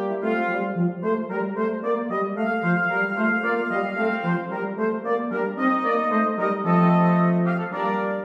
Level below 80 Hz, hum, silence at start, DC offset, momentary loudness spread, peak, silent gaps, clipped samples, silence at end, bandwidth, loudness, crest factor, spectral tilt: -76 dBFS; none; 0 s; under 0.1%; 7 LU; -8 dBFS; none; under 0.1%; 0 s; 5.2 kHz; -23 LUFS; 16 dB; -9.5 dB/octave